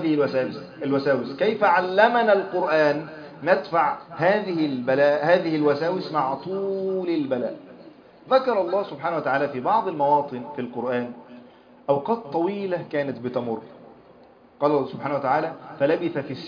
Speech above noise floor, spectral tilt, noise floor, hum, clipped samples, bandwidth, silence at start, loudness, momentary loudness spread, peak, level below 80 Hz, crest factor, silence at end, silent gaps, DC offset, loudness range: 29 dB; -7.5 dB/octave; -51 dBFS; none; under 0.1%; 5.2 kHz; 0 s; -23 LUFS; 10 LU; -2 dBFS; -70 dBFS; 20 dB; 0 s; none; under 0.1%; 6 LU